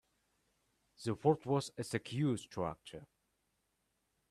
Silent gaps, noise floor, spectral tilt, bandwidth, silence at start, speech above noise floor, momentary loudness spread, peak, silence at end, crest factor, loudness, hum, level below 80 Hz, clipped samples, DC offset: none; -82 dBFS; -6.5 dB/octave; 13.5 kHz; 1 s; 45 dB; 16 LU; -16 dBFS; 1.25 s; 24 dB; -37 LUFS; none; -72 dBFS; under 0.1%; under 0.1%